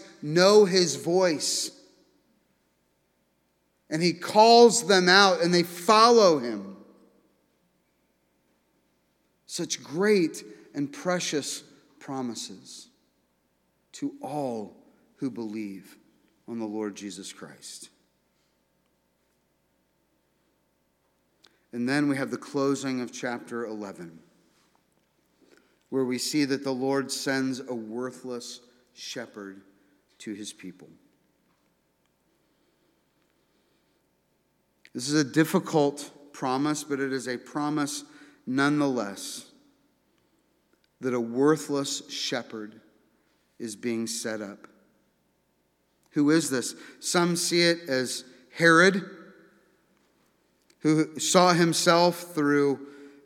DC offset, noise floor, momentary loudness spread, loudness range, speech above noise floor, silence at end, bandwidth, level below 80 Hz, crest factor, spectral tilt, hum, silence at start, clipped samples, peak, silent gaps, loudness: under 0.1%; -71 dBFS; 22 LU; 18 LU; 46 dB; 0.15 s; 17 kHz; -82 dBFS; 24 dB; -4 dB/octave; 60 Hz at -60 dBFS; 0 s; under 0.1%; -2 dBFS; none; -25 LUFS